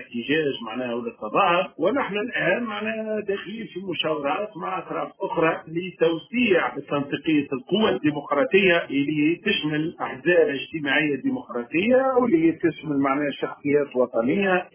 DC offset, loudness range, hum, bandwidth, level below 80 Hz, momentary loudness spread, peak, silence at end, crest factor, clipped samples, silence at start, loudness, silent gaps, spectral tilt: under 0.1%; 5 LU; none; 3.5 kHz; -62 dBFS; 10 LU; -6 dBFS; 0.05 s; 16 dB; under 0.1%; 0 s; -23 LUFS; none; -9.5 dB/octave